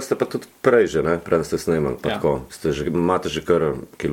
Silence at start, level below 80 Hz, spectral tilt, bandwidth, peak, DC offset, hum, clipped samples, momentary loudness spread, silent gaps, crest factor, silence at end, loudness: 0 s; -44 dBFS; -6 dB/octave; 17 kHz; -2 dBFS; under 0.1%; none; under 0.1%; 7 LU; none; 18 dB; 0 s; -21 LUFS